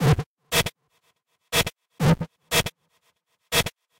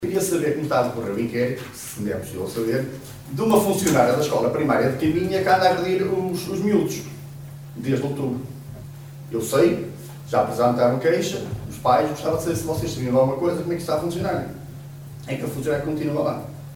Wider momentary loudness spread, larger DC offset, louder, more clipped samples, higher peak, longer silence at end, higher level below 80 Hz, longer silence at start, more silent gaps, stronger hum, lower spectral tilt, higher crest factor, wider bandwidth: second, 5 LU vs 18 LU; neither; about the same, -24 LUFS vs -22 LUFS; neither; second, -10 dBFS vs -4 dBFS; first, 0.3 s vs 0 s; first, -44 dBFS vs -50 dBFS; about the same, 0 s vs 0 s; first, 0.26-0.36 s vs none; neither; second, -4 dB/octave vs -5.5 dB/octave; about the same, 16 dB vs 18 dB; second, 16.5 kHz vs 19.5 kHz